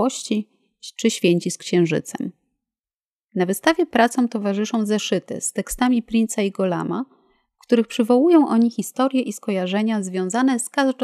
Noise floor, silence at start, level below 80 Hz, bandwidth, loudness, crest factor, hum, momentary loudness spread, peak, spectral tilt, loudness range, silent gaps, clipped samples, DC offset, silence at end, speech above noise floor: under -90 dBFS; 0 s; -54 dBFS; 15 kHz; -21 LUFS; 18 dB; none; 9 LU; -4 dBFS; -5 dB/octave; 3 LU; 2.80-2.84 s, 2.94-3.27 s; under 0.1%; under 0.1%; 0 s; over 70 dB